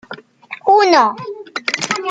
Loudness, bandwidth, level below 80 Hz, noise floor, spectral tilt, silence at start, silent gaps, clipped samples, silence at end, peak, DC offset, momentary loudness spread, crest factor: -14 LUFS; 9.4 kHz; -66 dBFS; -36 dBFS; -2.5 dB/octave; 0.1 s; none; under 0.1%; 0 s; 0 dBFS; under 0.1%; 23 LU; 16 dB